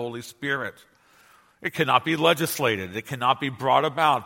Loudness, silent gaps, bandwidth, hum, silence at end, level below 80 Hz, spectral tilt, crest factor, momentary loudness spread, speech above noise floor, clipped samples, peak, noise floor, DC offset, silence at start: -24 LUFS; none; 17 kHz; none; 0 s; -68 dBFS; -4 dB/octave; 22 dB; 12 LU; 33 dB; under 0.1%; -2 dBFS; -57 dBFS; under 0.1%; 0 s